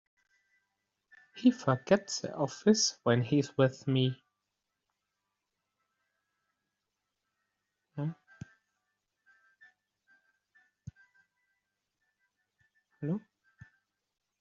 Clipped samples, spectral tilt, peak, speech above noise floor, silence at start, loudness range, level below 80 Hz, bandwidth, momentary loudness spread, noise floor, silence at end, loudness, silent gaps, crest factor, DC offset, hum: under 0.1%; -5.5 dB/octave; -10 dBFS; 57 dB; 1.35 s; 18 LU; -74 dBFS; 7.4 kHz; 24 LU; -86 dBFS; 1.2 s; -30 LUFS; none; 26 dB; under 0.1%; none